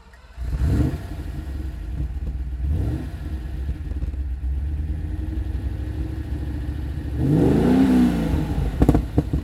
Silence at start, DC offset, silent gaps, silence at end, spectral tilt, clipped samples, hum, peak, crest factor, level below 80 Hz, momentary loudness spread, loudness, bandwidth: 0.05 s; under 0.1%; none; 0 s; -8.5 dB/octave; under 0.1%; none; -2 dBFS; 22 dB; -26 dBFS; 14 LU; -24 LUFS; 13.5 kHz